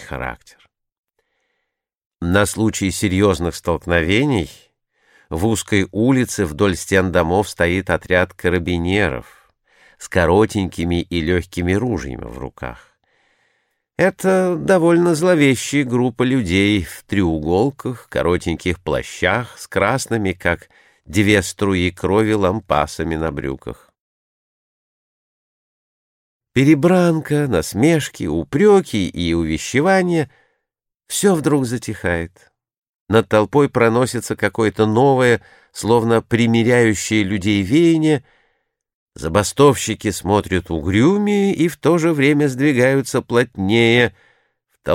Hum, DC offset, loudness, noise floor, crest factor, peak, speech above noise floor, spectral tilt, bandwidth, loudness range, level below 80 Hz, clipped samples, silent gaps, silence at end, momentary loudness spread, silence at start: none; under 0.1%; -17 LUFS; -79 dBFS; 16 dB; 0 dBFS; 63 dB; -5.5 dB/octave; 16.5 kHz; 5 LU; -40 dBFS; under 0.1%; 0.98-1.04 s, 2.06-2.11 s, 24.00-26.40 s, 32.77-33.07 s, 38.94-39.07 s; 0 s; 9 LU; 0 s